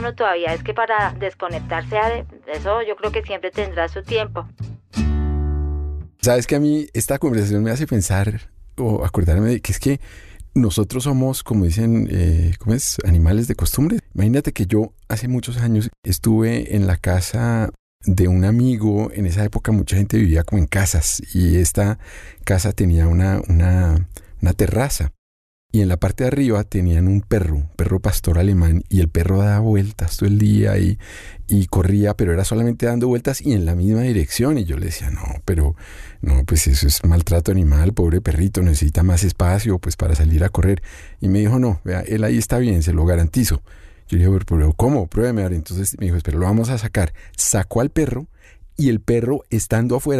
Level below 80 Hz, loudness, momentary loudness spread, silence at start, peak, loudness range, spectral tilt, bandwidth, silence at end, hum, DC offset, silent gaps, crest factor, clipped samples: -28 dBFS; -19 LUFS; 8 LU; 0 s; -4 dBFS; 3 LU; -6 dB/octave; 14 kHz; 0 s; none; under 0.1%; 15.98-16.03 s, 17.79-18.00 s, 25.18-25.70 s; 12 dB; under 0.1%